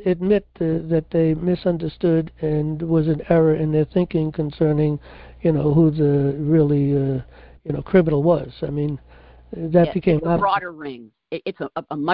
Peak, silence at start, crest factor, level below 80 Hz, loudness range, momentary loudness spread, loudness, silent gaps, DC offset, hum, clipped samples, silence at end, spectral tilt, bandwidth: -4 dBFS; 0 s; 16 dB; -44 dBFS; 3 LU; 13 LU; -20 LUFS; none; under 0.1%; none; under 0.1%; 0 s; -13 dB/octave; 5 kHz